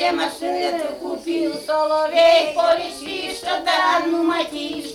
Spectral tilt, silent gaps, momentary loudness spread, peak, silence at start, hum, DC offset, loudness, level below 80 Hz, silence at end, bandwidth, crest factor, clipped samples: -2.5 dB/octave; none; 12 LU; -4 dBFS; 0 s; none; under 0.1%; -20 LUFS; -58 dBFS; 0 s; 14.5 kHz; 16 dB; under 0.1%